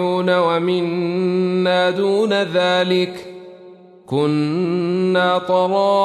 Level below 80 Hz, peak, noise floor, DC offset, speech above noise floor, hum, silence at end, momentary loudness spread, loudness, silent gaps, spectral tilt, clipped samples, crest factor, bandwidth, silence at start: -68 dBFS; -6 dBFS; -42 dBFS; under 0.1%; 25 dB; none; 0 s; 4 LU; -18 LUFS; none; -6.5 dB/octave; under 0.1%; 12 dB; 11.5 kHz; 0 s